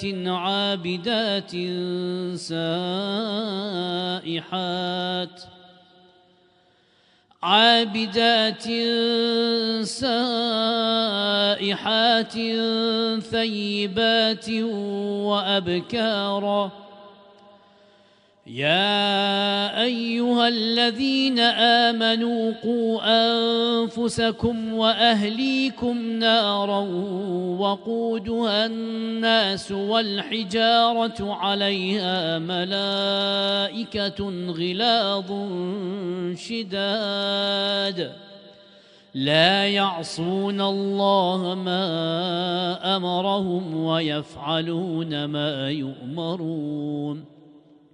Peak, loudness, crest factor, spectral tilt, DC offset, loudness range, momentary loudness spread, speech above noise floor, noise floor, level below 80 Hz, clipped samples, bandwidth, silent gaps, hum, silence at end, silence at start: -4 dBFS; -22 LUFS; 20 dB; -5 dB/octave; under 0.1%; 6 LU; 10 LU; 37 dB; -60 dBFS; -60 dBFS; under 0.1%; 10.5 kHz; none; none; 0.35 s; 0 s